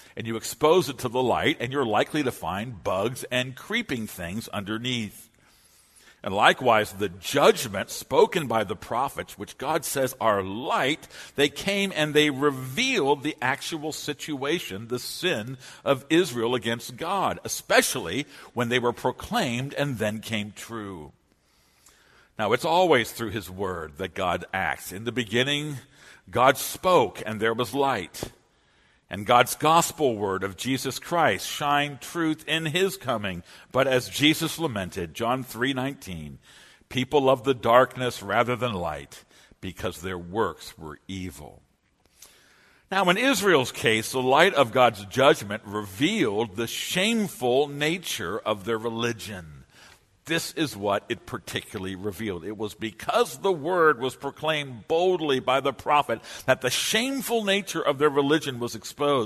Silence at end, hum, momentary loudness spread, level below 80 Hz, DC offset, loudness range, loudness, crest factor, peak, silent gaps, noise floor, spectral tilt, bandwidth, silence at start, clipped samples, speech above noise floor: 0 s; none; 12 LU; -58 dBFS; under 0.1%; 7 LU; -25 LUFS; 24 dB; -2 dBFS; none; -66 dBFS; -4 dB/octave; 13.5 kHz; 0.15 s; under 0.1%; 40 dB